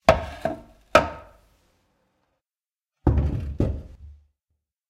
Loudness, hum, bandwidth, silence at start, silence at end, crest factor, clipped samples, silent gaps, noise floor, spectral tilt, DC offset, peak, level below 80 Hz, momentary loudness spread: -24 LUFS; none; 15 kHz; 0.05 s; 0.75 s; 24 dB; under 0.1%; none; under -90 dBFS; -6.5 dB/octave; under 0.1%; -4 dBFS; -34 dBFS; 18 LU